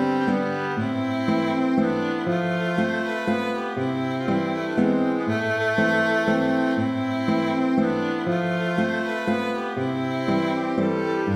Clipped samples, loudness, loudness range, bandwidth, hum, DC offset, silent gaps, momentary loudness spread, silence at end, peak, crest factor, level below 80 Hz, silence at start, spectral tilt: under 0.1%; -23 LUFS; 2 LU; 11 kHz; none; under 0.1%; none; 4 LU; 0 s; -8 dBFS; 14 dB; -64 dBFS; 0 s; -7 dB/octave